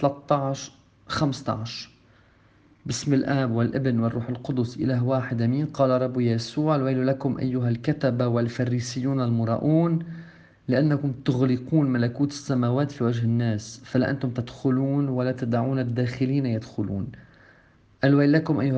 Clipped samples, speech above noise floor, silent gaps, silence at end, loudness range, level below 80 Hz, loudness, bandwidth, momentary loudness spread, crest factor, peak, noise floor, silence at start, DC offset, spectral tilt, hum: under 0.1%; 34 dB; none; 0 s; 3 LU; -58 dBFS; -25 LUFS; 9 kHz; 8 LU; 18 dB; -6 dBFS; -57 dBFS; 0 s; under 0.1%; -7 dB/octave; none